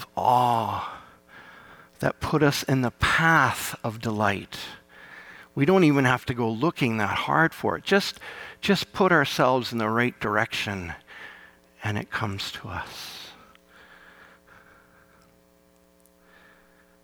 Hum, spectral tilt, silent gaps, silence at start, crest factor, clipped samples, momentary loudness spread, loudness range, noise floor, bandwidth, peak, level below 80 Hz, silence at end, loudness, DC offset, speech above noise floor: none; -5 dB/octave; none; 0 s; 20 dB; under 0.1%; 20 LU; 11 LU; -60 dBFS; 19 kHz; -6 dBFS; -54 dBFS; 3.7 s; -24 LUFS; under 0.1%; 35 dB